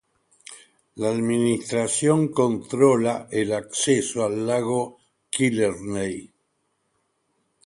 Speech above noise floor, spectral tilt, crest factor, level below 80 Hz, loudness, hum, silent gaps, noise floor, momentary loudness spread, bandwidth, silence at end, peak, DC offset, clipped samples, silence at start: 50 dB; -5 dB/octave; 20 dB; -60 dBFS; -23 LUFS; none; none; -72 dBFS; 11 LU; 11.5 kHz; 1.4 s; -4 dBFS; under 0.1%; under 0.1%; 0.5 s